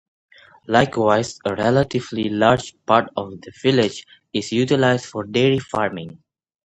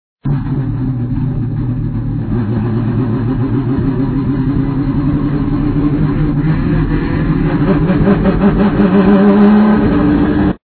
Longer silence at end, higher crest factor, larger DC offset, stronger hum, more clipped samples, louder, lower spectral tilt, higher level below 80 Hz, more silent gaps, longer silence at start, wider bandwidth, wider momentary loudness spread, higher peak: first, 0.55 s vs 0.1 s; first, 20 dB vs 12 dB; neither; neither; neither; second, -20 LUFS vs -13 LUFS; second, -5.5 dB/octave vs -12.5 dB/octave; second, -52 dBFS vs -24 dBFS; neither; first, 0.7 s vs 0.25 s; first, 9 kHz vs 4.5 kHz; about the same, 11 LU vs 9 LU; about the same, 0 dBFS vs 0 dBFS